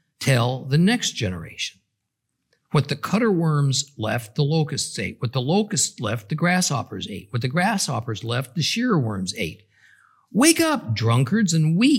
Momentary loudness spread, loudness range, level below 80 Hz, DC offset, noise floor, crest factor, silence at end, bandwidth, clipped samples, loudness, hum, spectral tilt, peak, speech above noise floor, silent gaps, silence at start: 10 LU; 3 LU; -62 dBFS; under 0.1%; -78 dBFS; 20 dB; 0 s; 16.5 kHz; under 0.1%; -22 LUFS; none; -4.5 dB/octave; -2 dBFS; 57 dB; none; 0.2 s